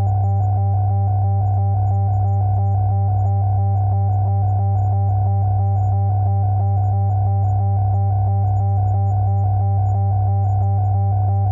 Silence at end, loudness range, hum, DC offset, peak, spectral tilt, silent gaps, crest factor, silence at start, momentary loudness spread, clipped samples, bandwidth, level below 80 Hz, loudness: 0 s; 0 LU; none; under 0.1%; -10 dBFS; -13 dB/octave; none; 6 dB; 0 s; 0 LU; under 0.1%; 1.6 kHz; -36 dBFS; -18 LUFS